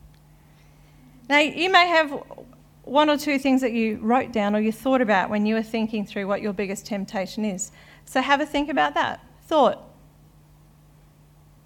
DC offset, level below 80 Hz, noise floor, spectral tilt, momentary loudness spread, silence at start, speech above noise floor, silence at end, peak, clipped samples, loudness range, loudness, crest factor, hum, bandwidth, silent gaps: under 0.1%; -56 dBFS; -53 dBFS; -4 dB/octave; 10 LU; 1.3 s; 31 dB; 1.8 s; -2 dBFS; under 0.1%; 5 LU; -22 LUFS; 22 dB; none; 17 kHz; none